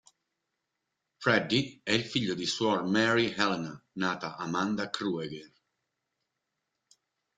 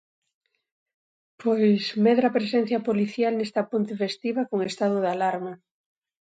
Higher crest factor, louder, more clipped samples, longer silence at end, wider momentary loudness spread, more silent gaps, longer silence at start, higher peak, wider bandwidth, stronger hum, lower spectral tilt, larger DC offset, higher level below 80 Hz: first, 24 dB vs 16 dB; second, -29 LUFS vs -24 LUFS; neither; first, 1.9 s vs 0.75 s; first, 10 LU vs 7 LU; neither; second, 1.2 s vs 1.4 s; about the same, -8 dBFS vs -8 dBFS; about the same, 9.4 kHz vs 9 kHz; neither; second, -4.5 dB/octave vs -6.5 dB/octave; neither; first, -68 dBFS vs -76 dBFS